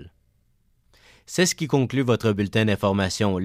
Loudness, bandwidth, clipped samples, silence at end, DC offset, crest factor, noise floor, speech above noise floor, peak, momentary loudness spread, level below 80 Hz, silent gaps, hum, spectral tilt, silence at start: -22 LUFS; 16 kHz; under 0.1%; 0 s; under 0.1%; 16 dB; -64 dBFS; 42 dB; -8 dBFS; 2 LU; -54 dBFS; none; none; -5 dB/octave; 0 s